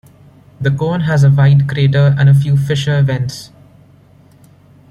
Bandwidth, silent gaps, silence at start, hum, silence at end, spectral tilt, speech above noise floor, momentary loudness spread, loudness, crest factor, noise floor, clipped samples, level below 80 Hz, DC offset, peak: 9.8 kHz; none; 0.6 s; none; 1.45 s; -7.5 dB/octave; 34 dB; 10 LU; -13 LUFS; 12 dB; -45 dBFS; under 0.1%; -44 dBFS; under 0.1%; -2 dBFS